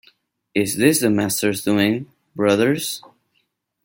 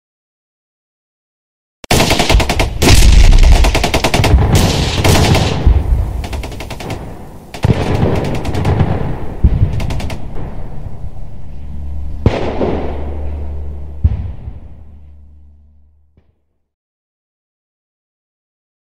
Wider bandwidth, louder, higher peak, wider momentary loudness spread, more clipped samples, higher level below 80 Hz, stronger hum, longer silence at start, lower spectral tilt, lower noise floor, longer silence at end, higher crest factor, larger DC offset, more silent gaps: about the same, 17 kHz vs 16.5 kHz; second, -19 LUFS vs -14 LUFS; about the same, -2 dBFS vs 0 dBFS; second, 11 LU vs 19 LU; neither; second, -60 dBFS vs -16 dBFS; neither; second, 0.55 s vs 1.85 s; about the same, -4.5 dB/octave vs -5 dB/octave; first, -69 dBFS vs -60 dBFS; second, 0.85 s vs 2.05 s; about the same, 18 dB vs 14 dB; second, under 0.1% vs 3%; neither